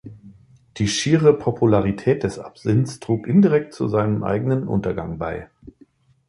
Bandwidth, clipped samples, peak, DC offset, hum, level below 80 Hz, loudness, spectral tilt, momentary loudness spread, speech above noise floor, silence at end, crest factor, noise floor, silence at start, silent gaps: 11.5 kHz; under 0.1%; -2 dBFS; under 0.1%; none; -46 dBFS; -20 LUFS; -6.5 dB/octave; 12 LU; 35 dB; 0.85 s; 18 dB; -55 dBFS; 0.05 s; none